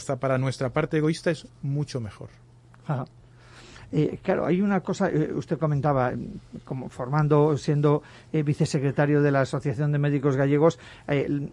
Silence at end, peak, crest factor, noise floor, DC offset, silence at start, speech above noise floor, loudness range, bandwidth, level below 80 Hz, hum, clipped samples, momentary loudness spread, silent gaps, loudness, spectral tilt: 0 s; -8 dBFS; 16 dB; -49 dBFS; under 0.1%; 0 s; 25 dB; 6 LU; 11 kHz; -56 dBFS; none; under 0.1%; 14 LU; none; -25 LUFS; -7.5 dB/octave